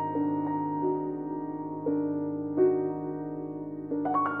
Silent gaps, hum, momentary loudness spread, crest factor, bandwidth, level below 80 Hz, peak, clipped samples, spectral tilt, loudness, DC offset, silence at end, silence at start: none; none; 10 LU; 16 dB; 3 kHz; -78 dBFS; -14 dBFS; under 0.1%; -11.5 dB/octave; -30 LUFS; under 0.1%; 0 s; 0 s